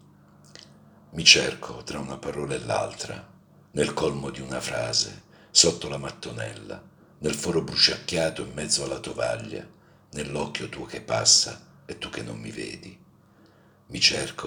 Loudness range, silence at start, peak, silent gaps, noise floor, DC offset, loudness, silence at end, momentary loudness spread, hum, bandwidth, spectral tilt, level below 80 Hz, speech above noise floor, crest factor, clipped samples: 5 LU; 0.55 s; 0 dBFS; none; -56 dBFS; under 0.1%; -24 LUFS; 0 s; 20 LU; none; over 20 kHz; -2 dB/octave; -56 dBFS; 30 dB; 28 dB; under 0.1%